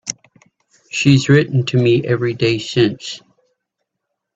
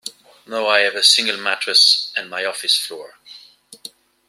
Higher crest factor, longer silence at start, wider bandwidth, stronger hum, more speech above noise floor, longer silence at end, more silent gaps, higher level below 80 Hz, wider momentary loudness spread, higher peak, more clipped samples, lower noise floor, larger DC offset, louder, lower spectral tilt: about the same, 18 dB vs 20 dB; about the same, 0.05 s vs 0.05 s; second, 8 kHz vs 16 kHz; neither; first, 62 dB vs 27 dB; first, 1.2 s vs 0.4 s; neither; first, -52 dBFS vs -78 dBFS; second, 16 LU vs 24 LU; about the same, 0 dBFS vs 0 dBFS; neither; first, -77 dBFS vs -45 dBFS; neither; about the same, -15 LUFS vs -15 LUFS; first, -5.5 dB/octave vs 1 dB/octave